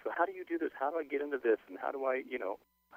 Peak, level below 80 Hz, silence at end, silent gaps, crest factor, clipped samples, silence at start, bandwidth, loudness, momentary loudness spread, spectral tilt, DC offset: -16 dBFS; -80 dBFS; 0 s; none; 20 dB; under 0.1%; 0 s; 15.5 kHz; -36 LUFS; 7 LU; -5.5 dB/octave; under 0.1%